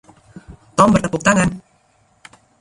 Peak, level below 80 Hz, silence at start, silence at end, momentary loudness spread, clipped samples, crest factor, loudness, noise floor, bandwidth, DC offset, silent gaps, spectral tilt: 0 dBFS; -42 dBFS; 0.5 s; 1 s; 10 LU; under 0.1%; 20 dB; -16 LUFS; -58 dBFS; 11.5 kHz; under 0.1%; none; -5.5 dB/octave